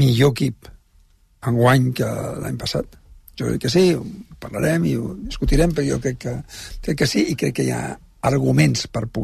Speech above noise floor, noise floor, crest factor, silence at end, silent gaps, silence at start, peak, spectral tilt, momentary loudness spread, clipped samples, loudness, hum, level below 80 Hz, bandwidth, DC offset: 35 dB; -55 dBFS; 16 dB; 0 s; none; 0 s; -4 dBFS; -6 dB/octave; 14 LU; under 0.1%; -20 LUFS; none; -34 dBFS; 13.5 kHz; under 0.1%